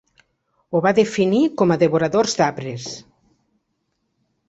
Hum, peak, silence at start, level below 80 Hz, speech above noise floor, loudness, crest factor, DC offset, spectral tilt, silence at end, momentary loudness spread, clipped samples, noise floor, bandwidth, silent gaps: none; -2 dBFS; 0.7 s; -60 dBFS; 54 dB; -18 LUFS; 18 dB; under 0.1%; -5.5 dB/octave; 1.5 s; 13 LU; under 0.1%; -72 dBFS; 8.2 kHz; none